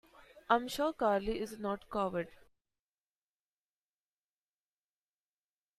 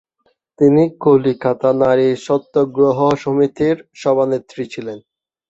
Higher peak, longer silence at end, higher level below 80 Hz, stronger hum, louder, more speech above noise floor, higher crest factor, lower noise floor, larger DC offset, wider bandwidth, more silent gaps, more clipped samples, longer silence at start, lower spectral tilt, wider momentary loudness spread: second, -14 dBFS vs -2 dBFS; first, 3.45 s vs 0.5 s; second, -62 dBFS vs -56 dBFS; first, 50 Hz at -70 dBFS vs none; second, -35 LUFS vs -16 LUFS; first, over 56 dB vs 49 dB; first, 26 dB vs 14 dB; first, under -90 dBFS vs -64 dBFS; neither; first, 15 kHz vs 8 kHz; neither; neither; second, 0.2 s vs 0.6 s; second, -5 dB/octave vs -7.5 dB/octave; second, 8 LU vs 13 LU